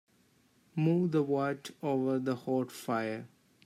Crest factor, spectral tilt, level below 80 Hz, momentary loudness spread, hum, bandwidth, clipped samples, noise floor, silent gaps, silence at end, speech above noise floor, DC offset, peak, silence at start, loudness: 16 dB; -7.5 dB/octave; -80 dBFS; 9 LU; none; 15 kHz; under 0.1%; -68 dBFS; none; 0.4 s; 37 dB; under 0.1%; -18 dBFS; 0.75 s; -32 LUFS